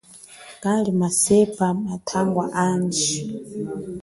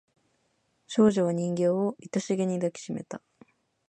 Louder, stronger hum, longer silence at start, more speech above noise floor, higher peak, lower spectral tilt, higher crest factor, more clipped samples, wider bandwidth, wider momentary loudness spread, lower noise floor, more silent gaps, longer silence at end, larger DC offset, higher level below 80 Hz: first, -22 LUFS vs -27 LUFS; neither; second, 0.1 s vs 0.9 s; second, 23 dB vs 46 dB; first, -6 dBFS vs -10 dBFS; second, -4.5 dB/octave vs -6.5 dB/octave; about the same, 18 dB vs 20 dB; neither; first, 12 kHz vs 9.2 kHz; about the same, 14 LU vs 14 LU; second, -44 dBFS vs -72 dBFS; neither; second, 0 s vs 0.7 s; neither; first, -56 dBFS vs -70 dBFS